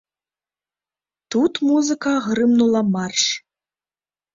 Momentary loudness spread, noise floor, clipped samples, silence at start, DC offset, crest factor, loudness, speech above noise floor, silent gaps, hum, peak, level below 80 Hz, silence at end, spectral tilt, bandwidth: 5 LU; under -90 dBFS; under 0.1%; 1.3 s; under 0.1%; 16 dB; -19 LUFS; over 72 dB; none; 50 Hz at -50 dBFS; -6 dBFS; -64 dBFS; 0.95 s; -4 dB/octave; 7.8 kHz